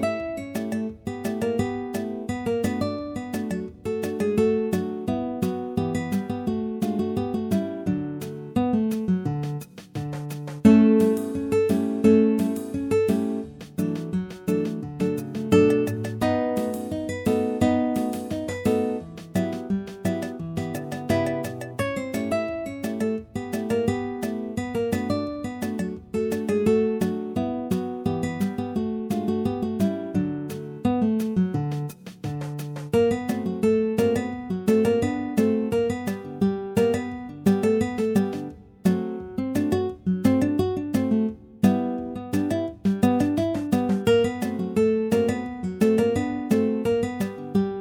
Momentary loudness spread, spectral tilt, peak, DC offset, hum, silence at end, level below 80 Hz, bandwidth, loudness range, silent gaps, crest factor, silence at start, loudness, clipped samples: 10 LU; -7 dB/octave; -2 dBFS; under 0.1%; none; 0 s; -52 dBFS; 18 kHz; 5 LU; none; 22 dB; 0 s; -25 LUFS; under 0.1%